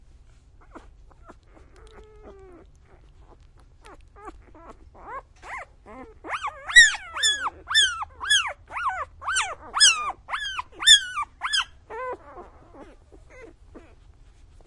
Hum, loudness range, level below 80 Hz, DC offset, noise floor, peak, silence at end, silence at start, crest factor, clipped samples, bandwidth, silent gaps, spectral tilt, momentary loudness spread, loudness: none; 13 LU; -52 dBFS; under 0.1%; -52 dBFS; -2 dBFS; 0.9 s; 0.75 s; 24 dB; under 0.1%; 11.5 kHz; none; 2 dB/octave; 24 LU; -20 LUFS